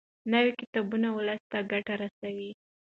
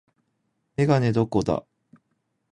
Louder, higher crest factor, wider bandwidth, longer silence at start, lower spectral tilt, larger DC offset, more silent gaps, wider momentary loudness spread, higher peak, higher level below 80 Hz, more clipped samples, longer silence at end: second, -30 LUFS vs -23 LUFS; about the same, 18 dB vs 18 dB; second, 5.4 kHz vs 10.5 kHz; second, 0.25 s vs 0.8 s; about the same, -7 dB/octave vs -8 dB/octave; neither; first, 0.67-0.73 s, 1.40-1.50 s, 2.11-2.22 s vs none; first, 12 LU vs 9 LU; second, -12 dBFS vs -8 dBFS; second, -76 dBFS vs -52 dBFS; neither; second, 0.4 s vs 0.9 s